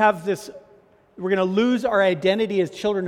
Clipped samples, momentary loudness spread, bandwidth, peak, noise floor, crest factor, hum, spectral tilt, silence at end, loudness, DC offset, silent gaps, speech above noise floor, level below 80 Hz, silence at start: under 0.1%; 10 LU; 14.5 kHz; -4 dBFS; -54 dBFS; 18 dB; none; -6 dB/octave; 0 s; -21 LUFS; under 0.1%; none; 33 dB; -60 dBFS; 0 s